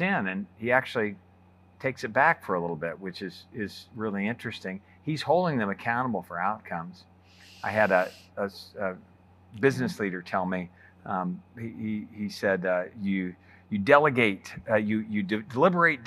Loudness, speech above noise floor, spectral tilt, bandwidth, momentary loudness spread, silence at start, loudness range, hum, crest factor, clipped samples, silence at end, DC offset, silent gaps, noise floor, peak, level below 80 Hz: -28 LUFS; 29 dB; -6.5 dB/octave; 14 kHz; 14 LU; 0 s; 5 LU; none; 24 dB; under 0.1%; 0 s; under 0.1%; none; -57 dBFS; -4 dBFS; -70 dBFS